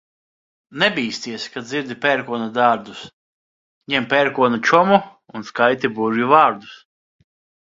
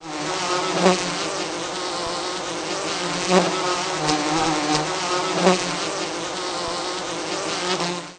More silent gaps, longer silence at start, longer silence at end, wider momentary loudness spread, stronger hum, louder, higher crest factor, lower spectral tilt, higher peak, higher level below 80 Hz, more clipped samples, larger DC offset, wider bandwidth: first, 3.13-3.81 s vs none; first, 0.75 s vs 0 s; first, 1 s vs 0 s; first, 17 LU vs 8 LU; neither; first, -18 LUFS vs -22 LUFS; about the same, 20 dB vs 22 dB; first, -4.5 dB/octave vs -3 dB/octave; about the same, 0 dBFS vs -2 dBFS; second, -64 dBFS vs -54 dBFS; neither; neither; second, 7.8 kHz vs 10 kHz